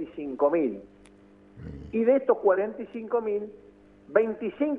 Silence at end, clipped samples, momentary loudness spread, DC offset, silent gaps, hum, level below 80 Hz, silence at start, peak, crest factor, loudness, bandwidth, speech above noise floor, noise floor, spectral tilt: 0 s; under 0.1%; 19 LU; under 0.1%; none; 50 Hz at -65 dBFS; -58 dBFS; 0 s; -6 dBFS; 20 dB; -26 LUFS; 3.8 kHz; 28 dB; -54 dBFS; -9 dB/octave